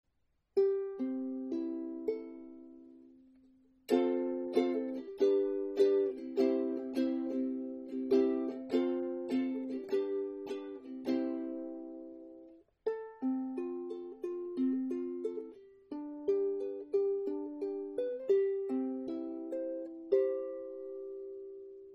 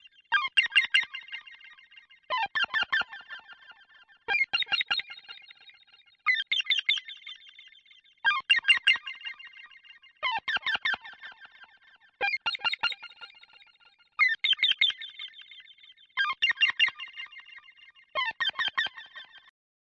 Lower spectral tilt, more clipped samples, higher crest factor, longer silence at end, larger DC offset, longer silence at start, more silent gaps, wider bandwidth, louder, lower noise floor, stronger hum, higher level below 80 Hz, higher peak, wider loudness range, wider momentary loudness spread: first, -6 dB/octave vs 1 dB/octave; neither; about the same, 20 dB vs 20 dB; second, 0 s vs 0.6 s; neither; first, 0.55 s vs 0.3 s; neither; second, 8.4 kHz vs 10.5 kHz; second, -35 LUFS vs -26 LUFS; first, -78 dBFS vs -62 dBFS; neither; about the same, -78 dBFS vs -76 dBFS; second, -16 dBFS vs -12 dBFS; about the same, 7 LU vs 6 LU; second, 15 LU vs 23 LU